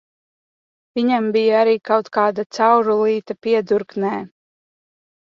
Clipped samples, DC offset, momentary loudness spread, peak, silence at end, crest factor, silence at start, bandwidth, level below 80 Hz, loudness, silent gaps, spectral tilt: under 0.1%; under 0.1%; 8 LU; -2 dBFS; 0.95 s; 16 dB; 0.95 s; 7.2 kHz; -68 dBFS; -18 LUFS; 2.46-2.50 s; -6 dB/octave